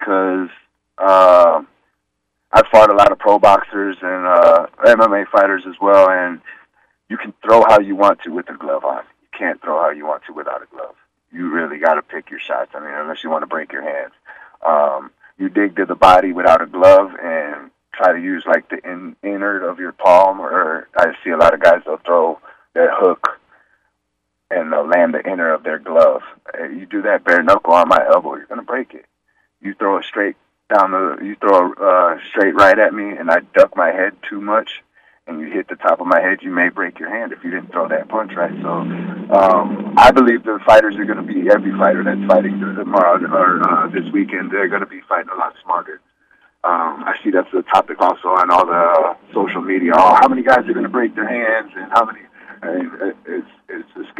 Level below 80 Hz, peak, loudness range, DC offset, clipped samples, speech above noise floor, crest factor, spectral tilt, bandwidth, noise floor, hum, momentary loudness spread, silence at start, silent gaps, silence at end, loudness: -50 dBFS; 0 dBFS; 8 LU; under 0.1%; under 0.1%; 58 dB; 14 dB; -6 dB/octave; 10.5 kHz; -73 dBFS; none; 16 LU; 0 s; none; 0.15 s; -14 LUFS